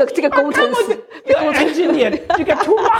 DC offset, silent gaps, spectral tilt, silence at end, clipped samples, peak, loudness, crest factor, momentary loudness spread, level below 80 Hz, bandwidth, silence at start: under 0.1%; none; -4 dB/octave; 0 s; under 0.1%; -2 dBFS; -15 LUFS; 14 dB; 4 LU; -50 dBFS; 16 kHz; 0 s